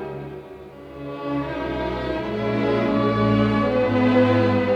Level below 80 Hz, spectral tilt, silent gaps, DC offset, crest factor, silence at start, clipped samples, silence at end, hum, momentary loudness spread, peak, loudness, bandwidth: -42 dBFS; -8.5 dB/octave; none; under 0.1%; 14 dB; 0 s; under 0.1%; 0 s; none; 19 LU; -6 dBFS; -21 LUFS; 7.8 kHz